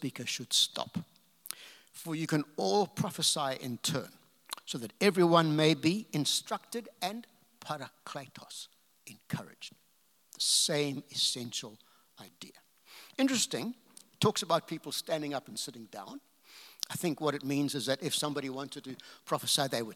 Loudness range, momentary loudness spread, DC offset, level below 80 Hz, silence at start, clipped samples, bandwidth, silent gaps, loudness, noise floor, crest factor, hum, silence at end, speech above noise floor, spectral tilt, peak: 7 LU; 21 LU; under 0.1%; -84 dBFS; 0 s; under 0.1%; 18 kHz; none; -32 LUFS; -70 dBFS; 24 dB; none; 0 s; 37 dB; -3.5 dB/octave; -10 dBFS